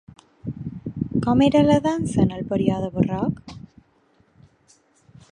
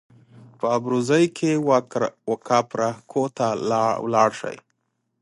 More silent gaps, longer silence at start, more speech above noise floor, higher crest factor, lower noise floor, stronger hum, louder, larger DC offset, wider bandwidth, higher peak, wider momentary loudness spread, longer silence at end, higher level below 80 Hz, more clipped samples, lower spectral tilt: neither; about the same, 0.45 s vs 0.4 s; second, 41 dB vs 53 dB; about the same, 20 dB vs 20 dB; second, -61 dBFS vs -74 dBFS; neither; about the same, -21 LUFS vs -22 LUFS; neither; about the same, 10.5 kHz vs 11.5 kHz; about the same, -4 dBFS vs -4 dBFS; first, 19 LU vs 9 LU; first, 1.75 s vs 0.65 s; first, -46 dBFS vs -68 dBFS; neither; first, -7.5 dB/octave vs -5.5 dB/octave